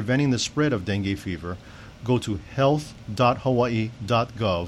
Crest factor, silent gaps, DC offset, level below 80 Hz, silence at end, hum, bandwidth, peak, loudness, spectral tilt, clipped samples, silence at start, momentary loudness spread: 16 dB; none; under 0.1%; -48 dBFS; 0 s; none; 12.5 kHz; -8 dBFS; -24 LUFS; -6 dB/octave; under 0.1%; 0 s; 12 LU